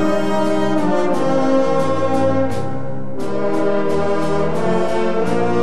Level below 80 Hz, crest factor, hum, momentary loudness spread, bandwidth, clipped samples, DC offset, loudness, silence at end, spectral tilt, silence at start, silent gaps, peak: -46 dBFS; 12 dB; none; 8 LU; 13.5 kHz; under 0.1%; 10%; -19 LUFS; 0 s; -7 dB/octave; 0 s; none; -4 dBFS